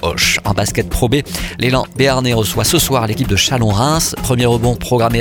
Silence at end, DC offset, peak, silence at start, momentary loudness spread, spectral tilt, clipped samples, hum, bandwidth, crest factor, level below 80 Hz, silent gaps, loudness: 0 s; under 0.1%; 0 dBFS; 0 s; 4 LU; -4 dB/octave; under 0.1%; none; 19 kHz; 14 dB; -28 dBFS; none; -14 LUFS